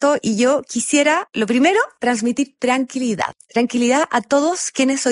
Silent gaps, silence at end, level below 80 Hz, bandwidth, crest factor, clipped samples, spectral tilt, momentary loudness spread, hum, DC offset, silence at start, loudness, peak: none; 0 s; -62 dBFS; 11.5 kHz; 16 dB; under 0.1%; -3 dB/octave; 6 LU; none; under 0.1%; 0 s; -18 LUFS; -2 dBFS